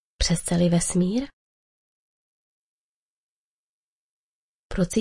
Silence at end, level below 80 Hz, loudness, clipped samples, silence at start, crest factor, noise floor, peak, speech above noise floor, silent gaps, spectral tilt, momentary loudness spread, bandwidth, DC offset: 0 s; -40 dBFS; -23 LUFS; under 0.1%; 0.2 s; 20 dB; under -90 dBFS; -8 dBFS; over 68 dB; 1.33-4.70 s; -5 dB/octave; 11 LU; 11.5 kHz; under 0.1%